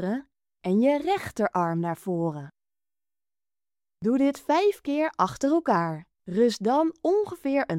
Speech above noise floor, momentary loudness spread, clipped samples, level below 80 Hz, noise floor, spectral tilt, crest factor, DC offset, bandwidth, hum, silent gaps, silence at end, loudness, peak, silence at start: over 65 dB; 9 LU; under 0.1%; -64 dBFS; under -90 dBFS; -6.5 dB/octave; 18 dB; under 0.1%; 16 kHz; none; none; 0 s; -26 LUFS; -8 dBFS; 0 s